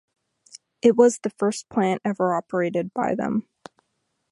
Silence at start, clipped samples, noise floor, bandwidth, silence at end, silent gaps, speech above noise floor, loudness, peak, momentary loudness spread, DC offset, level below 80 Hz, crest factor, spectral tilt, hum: 0.85 s; under 0.1%; -75 dBFS; 11.5 kHz; 0.9 s; none; 53 dB; -23 LUFS; -4 dBFS; 8 LU; under 0.1%; -66 dBFS; 20 dB; -6 dB/octave; none